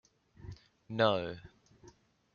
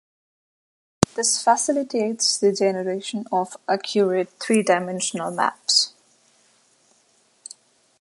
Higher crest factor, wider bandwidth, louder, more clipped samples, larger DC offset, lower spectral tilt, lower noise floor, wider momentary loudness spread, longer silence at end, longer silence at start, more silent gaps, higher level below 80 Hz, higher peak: about the same, 26 dB vs 24 dB; second, 7 kHz vs 12 kHz; second, -33 LUFS vs -21 LUFS; neither; neither; about the same, -3.5 dB/octave vs -3 dB/octave; about the same, -62 dBFS vs -62 dBFS; first, 24 LU vs 8 LU; second, 0.5 s vs 2.1 s; second, 0.4 s vs 1 s; neither; second, -66 dBFS vs -54 dBFS; second, -12 dBFS vs 0 dBFS